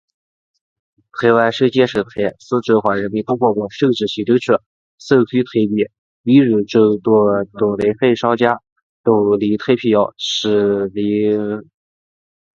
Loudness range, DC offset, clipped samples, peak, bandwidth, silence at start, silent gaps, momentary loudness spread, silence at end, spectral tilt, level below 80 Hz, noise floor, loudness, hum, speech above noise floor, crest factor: 2 LU; under 0.1%; under 0.1%; 0 dBFS; 7.6 kHz; 1.15 s; 4.66-4.98 s, 5.98-6.24 s, 8.72-8.76 s, 8.82-9.04 s; 7 LU; 1 s; -6.5 dB/octave; -56 dBFS; under -90 dBFS; -16 LUFS; none; over 75 dB; 16 dB